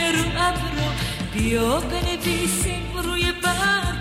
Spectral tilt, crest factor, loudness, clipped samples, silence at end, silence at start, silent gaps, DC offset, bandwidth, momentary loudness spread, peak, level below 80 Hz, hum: -3.5 dB/octave; 16 dB; -22 LUFS; under 0.1%; 0 s; 0 s; none; under 0.1%; 16 kHz; 5 LU; -8 dBFS; -32 dBFS; none